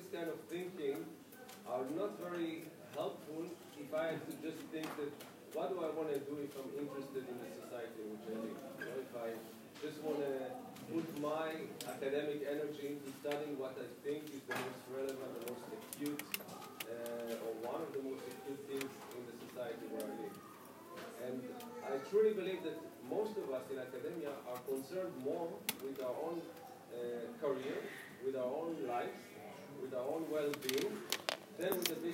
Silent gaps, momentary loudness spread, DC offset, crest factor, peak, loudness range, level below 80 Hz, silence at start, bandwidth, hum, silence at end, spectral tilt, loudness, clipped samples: none; 9 LU; under 0.1%; 28 dB; -14 dBFS; 5 LU; -88 dBFS; 0 s; 16 kHz; none; 0 s; -4 dB/octave; -43 LUFS; under 0.1%